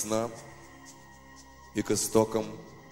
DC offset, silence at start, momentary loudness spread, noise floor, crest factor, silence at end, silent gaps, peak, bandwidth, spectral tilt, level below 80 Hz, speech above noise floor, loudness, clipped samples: under 0.1%; 0 s; 25 LU; -52 dBFS; 22 dB; 0 s; none; -10 dBFS; 16 kHz; -4 dB/octave; -58 dBFS; 23 dB; -30 LUFS; under 0.1%